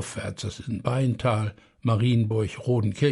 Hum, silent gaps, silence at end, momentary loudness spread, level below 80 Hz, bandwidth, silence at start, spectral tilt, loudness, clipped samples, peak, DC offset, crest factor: none; none; 0 s; 10 LU; -52 dBFS; 11.5 kHz; 0 s; -7 dB/octave; -26 LUFS; under 0.1%; -10 dBFS; under 0.1%; 16 dB